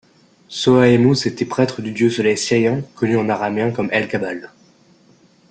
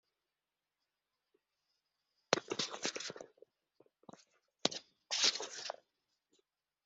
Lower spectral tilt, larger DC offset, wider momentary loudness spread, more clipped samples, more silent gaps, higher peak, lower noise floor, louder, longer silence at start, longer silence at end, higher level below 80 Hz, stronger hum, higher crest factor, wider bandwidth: first, -5.5 dB/octave vs -1 dB/octave; neither; second, 10 LU vs 18 LU; neither; neither; first, -2 dBFS vs -8 dBFS; second, -52 dBFS vs under -90 dBFS; first, -17 LUFS vs -37 LUFS; second, 0.5 s vs 2.3 s; about the same, 1.05 s vs 1.15 s; first, -56 dBFS vs under -90 dBFS; neither; second, 16 dB vs 36 dB; first, 9.4 kHz vs 8.2 kHz